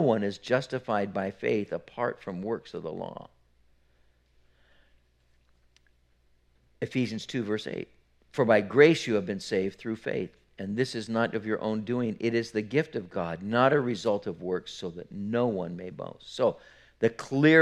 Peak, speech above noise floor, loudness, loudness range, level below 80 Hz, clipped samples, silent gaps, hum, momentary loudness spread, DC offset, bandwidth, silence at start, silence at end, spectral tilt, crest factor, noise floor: -6 dBFS; 38 dB; -29 LUFS; 12 LU; -66 dBFS; under 0.1%; none; none; 15 LU; under 0.1%; 11 kHz; 0 s; 0 s; -6 dB/octave; 24 dB; -66 dBFS